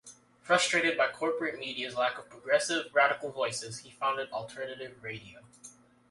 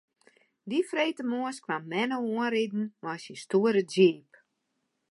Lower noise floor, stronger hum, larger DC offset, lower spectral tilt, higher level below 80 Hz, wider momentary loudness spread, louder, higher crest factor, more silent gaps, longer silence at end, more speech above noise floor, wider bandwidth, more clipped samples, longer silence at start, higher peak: second, -55 dBFS vs -79 dBFS; neither; neither; second, -2.5 dB/octave vs -5.5 dB/octave; first, -74 dBFS vs -84 dBFS; about the same, 16 LU vs 14 LU; about the same, -30 LUFS vs -28 LUFS; about the same, 22 dB vs 20 dB; neither; second, 0.4 s vs 0.9 s; second, 24 dB vs 51 dB; about the same, 11.5 kHz vs 11.5 kHz; neither; second, 0.05 s vs 0.65 s; about the same, -10 dBFS vs -10 dBFS